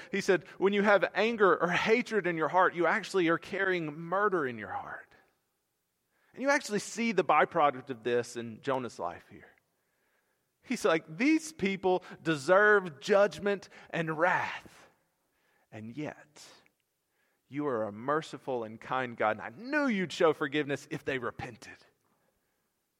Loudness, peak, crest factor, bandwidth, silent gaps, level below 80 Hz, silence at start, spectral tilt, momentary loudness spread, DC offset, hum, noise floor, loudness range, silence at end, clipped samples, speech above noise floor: -30 LUFS; -10 dBFS; 20 dB; 15 kHz; none; -74 dBFS; 0 s; -5 dB/octave; 14 LU; under 0.1%; none; -80 dBFS; 9 LU; 1.25 s; under 0.1%; 50 dB